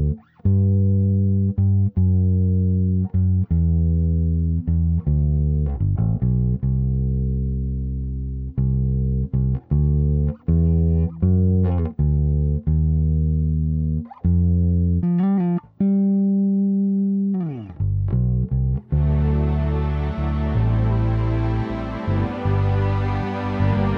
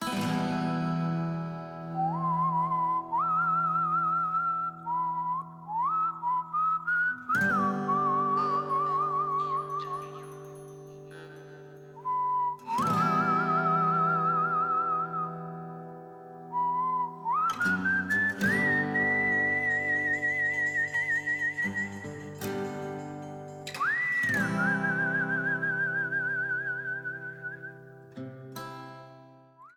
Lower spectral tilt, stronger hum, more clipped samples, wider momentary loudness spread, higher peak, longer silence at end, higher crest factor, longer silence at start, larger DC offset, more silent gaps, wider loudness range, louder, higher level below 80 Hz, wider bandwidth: first, -11.5 dB/octave vs -6 dB/octave; neither; neither; second, 6 LU vs 17 LU; first, -8 dBFS vs -16 dBFS; about the same, 0 s vs 0.05 s; about the same, 12 dB vs 14 dB; about the same, 0 s vs 0 s; neither; neither; second, 3 LU vs 6 LU; first, -21 LUFS vs -28 LUFS; first, -26 dBFS vs -68 dBFS; second, 4.4 kHz vs 18.5 kHz